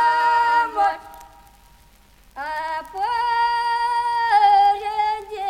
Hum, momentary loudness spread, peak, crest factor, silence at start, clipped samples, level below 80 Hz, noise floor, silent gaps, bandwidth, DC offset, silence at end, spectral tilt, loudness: none; 13 LU; -6 dBFS; 14 dB; 0 s; under 0.1%; -54 dBFS; -52 dBFS; none; 15.5 kHz; under 0.1%; 0 s; -1.5 dB/octave; -19 LUFS